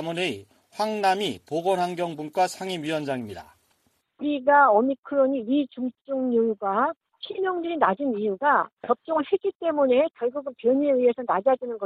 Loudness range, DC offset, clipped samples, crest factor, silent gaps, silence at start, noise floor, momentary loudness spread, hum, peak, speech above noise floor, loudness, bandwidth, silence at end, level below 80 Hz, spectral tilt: 4 LU; under 0.1%; under 0.1%; 18 dB; 4.98-5.03 s, 6.01-6.05 s, 6.97-7.01 s, 8.73-8.77 s, 9.55-9.60 s; 0 s; -69 dBFS; 10 LU; none; -6 dBFS; 45 dB; -24 LUFS; 13.5 kHz; 0 s; -70 dBFS; -5.5 dB/octave